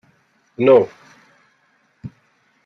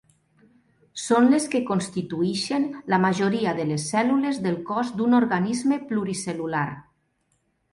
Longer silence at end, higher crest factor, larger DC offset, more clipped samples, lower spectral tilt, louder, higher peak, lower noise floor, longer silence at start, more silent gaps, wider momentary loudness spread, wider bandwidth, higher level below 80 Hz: second, 0.55 s vs 0.9 s; about the same, 20 dB vs 16 dB; neither; neither; first, -8 dB/octave vs -5.5 dB/octave; first, -15 LUFS vs -24 LUFS; first, -2 dBFS vs -8 dBFS; second, -61 dBFS vs -70 dBFS; second, 0.6 s vs 0.95 s; neither; first, 26 LU vs 9 LU; second, 6.2 kHz vs 11.5 kHz; about the same, -64 dBFS vs -64 dBFS